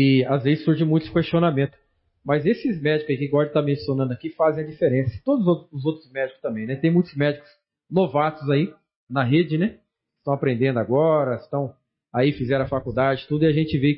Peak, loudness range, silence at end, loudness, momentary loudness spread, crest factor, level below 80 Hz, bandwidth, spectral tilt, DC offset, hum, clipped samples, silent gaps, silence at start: -8 dBFS; 2 LU; 0 s; -22 LUFS; 8 LU; 14 dB; -54 dBFS; 5.8 kHz; -12 dB/octave; under 0.1%; none; under 0.1%; 8.96-9.07 s; 0 s